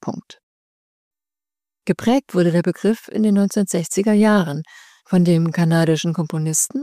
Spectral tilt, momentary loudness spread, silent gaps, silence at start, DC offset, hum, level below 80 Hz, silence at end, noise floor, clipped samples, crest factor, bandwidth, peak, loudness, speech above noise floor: -5.5 dB/octave; 10 LU; 0.43-1.11 s; 0.05 s; under 0.1%; none; -62 dBFS; 0 s; under -90 dBFS; under 0.1%; 12 dB; 15.5 kHz; -6 dBFS; -18 LUFS; over 73 dB